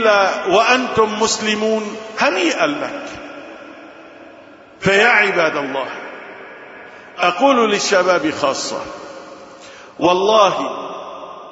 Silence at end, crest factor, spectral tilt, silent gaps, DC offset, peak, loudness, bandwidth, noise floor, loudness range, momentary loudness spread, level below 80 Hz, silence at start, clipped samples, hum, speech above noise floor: 0 s; 18 dB; -3 dB/octave; none; under 0.1%; 0 dBFS; -16 LUFS; 8 kHz; -42 dBFS; 3 LU; 23 LU; -56 dBFS; 0 s; under 0.1%; none; 26 dB